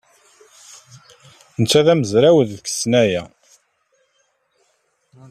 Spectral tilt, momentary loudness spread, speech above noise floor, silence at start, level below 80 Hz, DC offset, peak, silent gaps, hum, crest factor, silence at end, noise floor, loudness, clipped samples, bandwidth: -5 dB/octave; 10 LU; 50 dB; 1.6 s; -58 dBFS; under 0.1%; -2 dBFS; none; none; 18 dB; 2.05 s; -65 dBFS; -16 LUFS; under 0.1%; 14 kHz